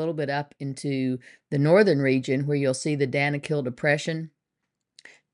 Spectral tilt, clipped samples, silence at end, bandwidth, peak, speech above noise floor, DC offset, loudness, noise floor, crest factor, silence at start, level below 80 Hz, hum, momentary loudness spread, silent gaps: -6 dB/octave; under 0.1%; 1.05 s; 11 kHz; -6 dBFS; 58 dB; under 0.1%; -25 LUFS; -82 dBFS; 18 dB; 0 s; -70 dBFS; none; 13 LU; none